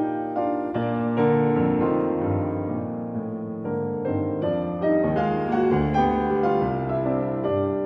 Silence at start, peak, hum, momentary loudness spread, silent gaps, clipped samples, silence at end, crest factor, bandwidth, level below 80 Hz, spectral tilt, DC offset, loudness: 0 s; -10 dBFS; none; 8 LU; none; under 0.1%; 0 s; 14 dB; 6 kHz; -46 dBFS; -10 dB/octave; under 0.1%; -24 LUFS